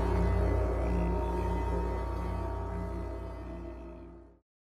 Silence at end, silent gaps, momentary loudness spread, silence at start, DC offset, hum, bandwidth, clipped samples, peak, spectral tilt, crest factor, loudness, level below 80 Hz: 0.4 s; none; 15 LU; 0 s; under 0.1%; none; 10.5 kHz; under 0.1%; -18 dBFS; -8.5 dB/octave; 14 dB; -34 LUFS; -34 dBFS